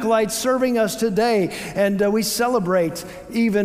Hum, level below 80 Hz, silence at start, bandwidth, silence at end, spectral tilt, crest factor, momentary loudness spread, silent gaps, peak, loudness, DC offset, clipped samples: none; -52 dBFS; 0 s; 16 kHz; 0 s; -4.5 dB/octave; 14 dB; 5 LU; none; -6 dBFS; -20 LUFS; under 0.1%; under 0.1%